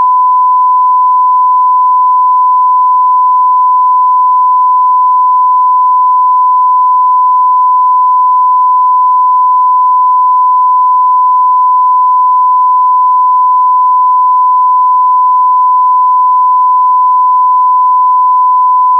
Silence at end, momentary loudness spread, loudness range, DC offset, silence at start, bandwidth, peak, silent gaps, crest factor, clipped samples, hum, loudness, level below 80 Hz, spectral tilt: 0 s; 0 LU; 0 LU; under 0.1%; 0 s; 1.2 kHz; -4 dBFS; none; 4 dB; under 0.1%; none; -7 LUFS; under -90 dBFS; -4 dB/octave